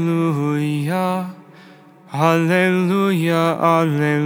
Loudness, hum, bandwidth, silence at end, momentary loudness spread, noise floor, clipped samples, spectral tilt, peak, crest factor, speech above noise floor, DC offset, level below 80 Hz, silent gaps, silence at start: -18 LUFS; none; 17.5 kHz; 0 s; 6 LU; -45 dBFS; under 0.1%; -7 dB/octave; -2 dBFS; 16 dB; 27 dB; under 0.1%; -78 dBFS; none; 0 s